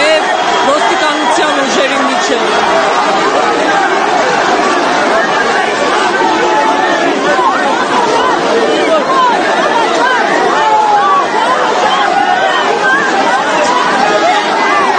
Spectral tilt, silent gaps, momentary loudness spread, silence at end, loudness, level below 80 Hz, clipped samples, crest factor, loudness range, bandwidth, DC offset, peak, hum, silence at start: -2.5 dB/octave; none; 2 LU; 0 s; -10 LUFS; -50 dBFS; under 0.1%; 10 dB; 1 LU; 9.6 kHz; under 0.1%; 0 dBFS; none; 0 s